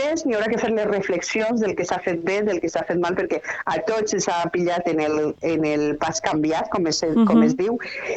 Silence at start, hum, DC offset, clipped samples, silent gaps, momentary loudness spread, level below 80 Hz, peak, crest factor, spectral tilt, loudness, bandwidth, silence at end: 0 s; none; under 0.1%; under 0.1%; none; 6 LU; -54 dBFS; -4 dBFS; 18 dB; -4.5 dB/octave; -22 LUFS; 8.2 kHz; 0 s